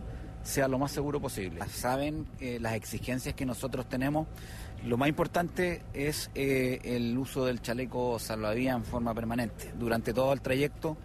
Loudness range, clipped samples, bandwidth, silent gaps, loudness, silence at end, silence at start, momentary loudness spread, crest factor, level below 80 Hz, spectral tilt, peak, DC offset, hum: 3 LU; under 0.1%; 13.5 kHz; none; -32 LUFS; 0 s; 0 s; 8 LU; 16 dB; -46 dBFS; -5.5 dB/octave; -16 dBFS; under 0.1%; none